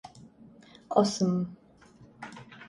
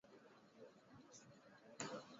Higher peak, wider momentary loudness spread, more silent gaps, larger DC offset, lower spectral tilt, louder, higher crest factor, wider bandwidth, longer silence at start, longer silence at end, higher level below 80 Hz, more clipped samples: first, -10 dBFS vs -30 dBFS; first, 21 LU vs 15 LU; neither; neither; first, -6 dB/octave vs -3.5 dB/octave; first, -28 LUFS vs -58 LUFS; second, 22 dB vs 28 dB; first, 11.5 kHz vs 7.6 kHz; about the same, 0.05 s vs 0.05 s; about the same, 0 s vs 0 s; first, -68 dBFS vs under -90 dBFS; neither